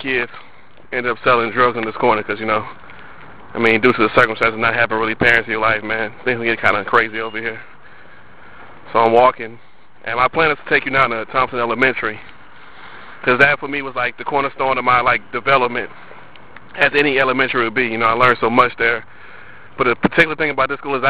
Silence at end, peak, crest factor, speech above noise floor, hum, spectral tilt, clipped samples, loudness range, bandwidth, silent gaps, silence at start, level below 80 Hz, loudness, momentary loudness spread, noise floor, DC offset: 0 s; 0 dBFS; 18 dB; 27 dB; none; -6 dB/octave; under 0.1%; 3 LU; 11 kHz; none; 0 s; -48 dBFS; -16 LUFS; 11 LU; -44 dBFS; 2%